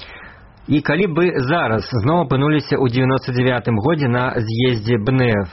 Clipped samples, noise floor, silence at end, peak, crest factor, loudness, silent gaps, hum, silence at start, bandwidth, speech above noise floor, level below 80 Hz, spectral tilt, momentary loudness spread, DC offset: under 0.1%; -41 dBFS; 0 s; -6 dBFS; 12 dB; -17 LUFS; none; none; 0 s; 6 kHz; 24 dB; -44 dBFS; -6 dB/octave; 3 LU; under 0.1%